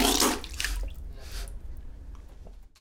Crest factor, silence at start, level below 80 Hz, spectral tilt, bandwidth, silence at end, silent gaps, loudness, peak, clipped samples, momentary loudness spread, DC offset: 24 dB; 0 s; -38 dBFS; -2 dB/octave; 18 kHz; 0.15 s; none; -29 LUFS; -6 dBFS; under 0.1%; 25 LU; under 0.1%